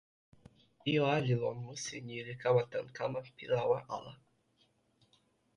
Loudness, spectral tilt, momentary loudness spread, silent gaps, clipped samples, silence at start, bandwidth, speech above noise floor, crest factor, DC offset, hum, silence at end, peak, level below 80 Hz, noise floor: -35 LUFS; -5.5 dB/octave; 12 LU; none; under 0.1%; 0.85 s; 11 kHz; 39 dB; 20 dB; under 0.1%; none; 1.4 s; -16 dBFS; -72 dBFS; -73 dBFS